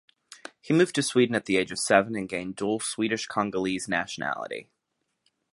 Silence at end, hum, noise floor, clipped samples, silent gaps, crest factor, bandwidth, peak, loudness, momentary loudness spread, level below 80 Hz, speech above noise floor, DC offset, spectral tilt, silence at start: 0.9 s; none; -79 dBFS; under 0.1%; none; 24 dB; 11.5 kHz; -4 dBFS; -26 LUFS; 13 LU; -64 dBFS; 53 dB; under 0.1%; -4 dB/octave; 0.3 s